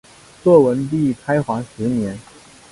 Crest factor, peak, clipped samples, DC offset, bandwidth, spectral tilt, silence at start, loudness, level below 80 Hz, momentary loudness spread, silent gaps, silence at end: 18 dB; 0 dBFS; under 0.1%; under 0.1%; 11.5 kHz; -8 dB/octave; 0.45 s; -18 LUFS; -52 dBFS; 12 LU; none; 0.5 s